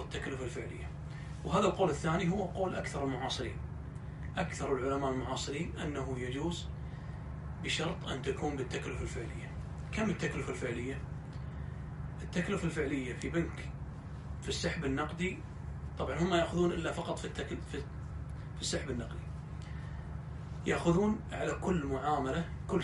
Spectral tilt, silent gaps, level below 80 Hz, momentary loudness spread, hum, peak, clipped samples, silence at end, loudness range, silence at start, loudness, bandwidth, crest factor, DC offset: -5.5 dB/octave; none; -46 dBFS; 12 LU; none; -16 dBFS; under 0.1%; 0 s; 4 LU; 0 s; -37 LUFS; 11.5 kHz; 20 dB; under 0.1%